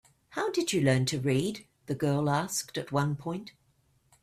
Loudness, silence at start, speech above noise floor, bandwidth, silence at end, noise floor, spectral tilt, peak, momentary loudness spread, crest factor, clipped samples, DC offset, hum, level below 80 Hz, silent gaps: -30 LUFS; 0.3 s; 40 dB; 15.5 kHz; 0.7 s; -69 dBFS; -5 dB/octave; -14 dBFS; 13 LU; 18 dB; under 0.1%; under 0.1%; none; -64 dBFS; none